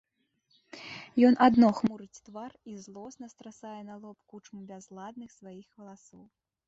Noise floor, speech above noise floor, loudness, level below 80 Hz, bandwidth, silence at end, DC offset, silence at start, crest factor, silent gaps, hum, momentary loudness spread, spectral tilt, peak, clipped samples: -74 dBFS; 45 dB; -24 LUFS; -68 dBFS; 7.8 kHz; 1.15 s; under 0.1%; 0.85 s; 24 dB; none; none; 28 LU; -6 dB/octave; -8 dBFS; under 0.1%